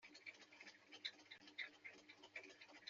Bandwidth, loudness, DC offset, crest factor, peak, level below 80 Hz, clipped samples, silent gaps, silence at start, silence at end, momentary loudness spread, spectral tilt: 7.4 kHz; -56 LUFS; under 0.1%; 24 dB; -34 dBFS; under -90 dBFS; under 0.1%; none; 0 s; 0 s; 9 LU; 1.5 dB/octave